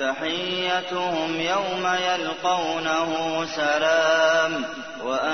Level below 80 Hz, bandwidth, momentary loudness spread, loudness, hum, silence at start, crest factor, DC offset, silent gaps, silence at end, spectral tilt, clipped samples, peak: -64 dBFS; 6.6 kHz; 7 LU; -23 LUFS; none; 0 s; 16 dB; 0.2%; none; 0 s; -3 dB/octave; under 0.1%; -8 dBFS